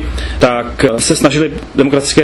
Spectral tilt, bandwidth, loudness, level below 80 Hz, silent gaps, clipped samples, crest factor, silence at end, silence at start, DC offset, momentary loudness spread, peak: -4.5 dB/octave; 12.5 kHz; -12 LUFS; -26 dBFS; none; 0.2%; 12 dB; 0 s; 0 s; under 0.1%; 5 LU; 0 dBFS